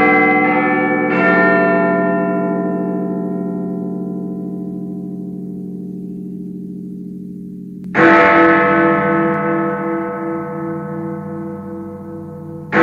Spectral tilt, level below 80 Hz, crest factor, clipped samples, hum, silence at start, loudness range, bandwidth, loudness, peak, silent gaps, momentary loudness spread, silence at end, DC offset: -8.5 dB/octave; -56 dBFS; 16 dB; under 0.1%; none; 0 s; 12 LU; 7.2 kHz; -15 LUFS; 0 dBFS; none; 18 LU; 0 s; under 0.1%